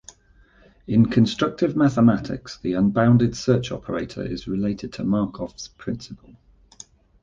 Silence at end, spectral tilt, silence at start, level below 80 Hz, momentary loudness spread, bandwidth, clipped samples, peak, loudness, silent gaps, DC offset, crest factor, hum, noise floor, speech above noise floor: 1.1 s; -7 dB/octave; 0.9 s; -48 dBFS; 15 LU; 7.6 kHz; under 0.1%; -4 dBFS; -22 LUFS; none; under 0.1%; 18 dB; none; -55 dBFS; 34 dB